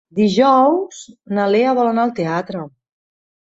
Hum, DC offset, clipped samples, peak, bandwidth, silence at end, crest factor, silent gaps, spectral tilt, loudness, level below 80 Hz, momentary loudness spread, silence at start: none; under 0.1%; under 0.1%; -2 dBFS; 8 kHz; 0.8 s; 14 dB; none; -6 dB/octave; -16 LUFS; -62 dBFS; 18 LU; 0.15 s